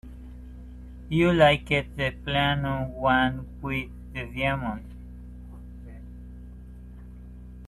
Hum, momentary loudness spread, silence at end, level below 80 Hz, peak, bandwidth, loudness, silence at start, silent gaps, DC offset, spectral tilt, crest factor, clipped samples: none; 24 LU; 0 s; -42 dBFS; -6 dBFS; 13 kHz; -25 LUFS; 0.05 s; none; under 0.1%; -6.5 dB/octave; 22 dB; under 0.1%